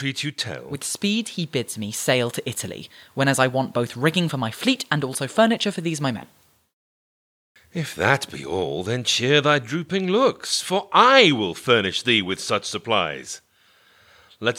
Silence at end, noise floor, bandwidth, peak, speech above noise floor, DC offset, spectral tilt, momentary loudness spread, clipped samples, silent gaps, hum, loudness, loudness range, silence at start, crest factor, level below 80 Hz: 0 s; -58 dBFS; 19.5 kHz; -2 dBFS; 36 dB; under 0.1%; -4 dB/octave; 12 LU; under 0.1%; 6.73-7.55 s; none; -21 LUFS; 7 LU; 0 s; 22 dB; -68 dBFS